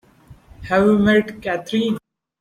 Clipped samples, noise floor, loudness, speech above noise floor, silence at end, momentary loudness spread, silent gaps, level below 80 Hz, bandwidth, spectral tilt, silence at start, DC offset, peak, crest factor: under 0.1%; -47 dBFS; -18 LUFS; 30 dB; 0.4 s; 12 LU; none; -48 dBFS; 11 kHz; -6.5 dB/octave; 0.3 s; under 0.1%; -4 dBFS; 16 dB